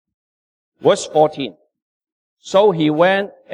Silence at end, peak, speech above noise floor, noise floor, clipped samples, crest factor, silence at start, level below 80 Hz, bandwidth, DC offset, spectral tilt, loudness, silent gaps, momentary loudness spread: 0 s; -2 dBFS; over 74 dB; under -90 dBFS; under 0.1%; 16 dB; 0.8 s; -66 dBFS; 10.5 kHz; under 0.1%; -5 dB/octave; -16 LUFS; 1.82-2.01 s, 2.12-2.37 s; 7 LU